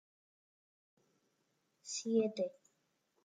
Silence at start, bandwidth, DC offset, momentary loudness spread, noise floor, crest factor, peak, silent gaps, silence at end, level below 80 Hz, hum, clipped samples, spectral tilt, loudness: 1.85 s; 9.6 kHz; under 0.1%; 11 LU; -81 dBFS; 22 dB; -22 dBFS; none; 0.75 s; under -90 dBFS; none; under 0.1%; -4 dB/octave; -38 LUFS